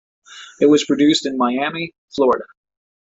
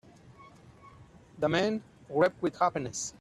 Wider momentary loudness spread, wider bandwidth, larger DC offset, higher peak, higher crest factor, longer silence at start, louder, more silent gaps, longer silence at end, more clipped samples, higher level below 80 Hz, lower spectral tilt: first, 13 LU vs 8 LU; second, 8 kHz vs 13 kHz; neither; first, -2 dBFS vs -12 dBFS; about the same, 16 dB vs 20 dB; about the same, 0.3 s vs 0.25 s; first, -17 LUFS vs -30 LUFS; first, 1.98-2.08 s vs none; first, 0.7 s vs 0.1 s; neither; about the same, -60 dBFS vs -64 dBFS; about the same, -4 dB/octave vs -4.5 dB/octave